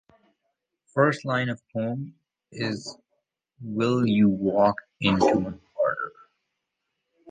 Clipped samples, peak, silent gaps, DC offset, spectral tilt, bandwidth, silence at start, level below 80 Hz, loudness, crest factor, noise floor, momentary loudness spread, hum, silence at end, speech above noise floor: under 0.1%; -6 dBFS; none; under 0.1%; -6.5 dB/octave; 9.4 kHz; 0.95 s; -58 dBFS; -25 LUFS; 20 dB; -81 dBFS; 14 LU; none; 0 s; 57 dB